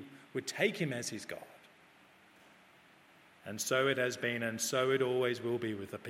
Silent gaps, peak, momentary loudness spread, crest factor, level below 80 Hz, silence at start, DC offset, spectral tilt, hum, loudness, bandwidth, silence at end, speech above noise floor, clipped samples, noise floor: none; -16 dBFS; 15 LU; 20 dB; -82 dBFS; 0 s; under 0.1%; -3.5 dB/octave; none; -34 LUFS; 16 kHz; 0 s; 28 dB; under 0.1%; -62 dBFS